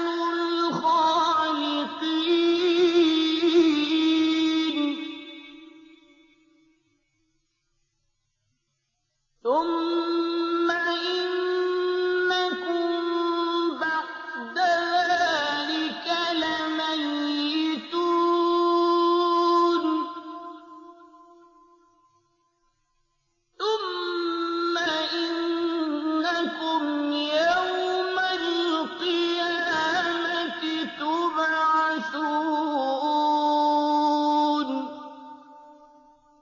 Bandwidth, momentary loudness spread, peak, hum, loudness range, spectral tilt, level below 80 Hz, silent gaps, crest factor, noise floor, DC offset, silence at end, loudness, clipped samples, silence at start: 7.4 kHz; 7 LU; -10 dBFS; none; 8 LU; -3 dB/octave; -70 dBFS; none; 16 dB; -76 dBFS; under 0.1%; 0.7 s; -24 LUFS; under 0.1%; 0 s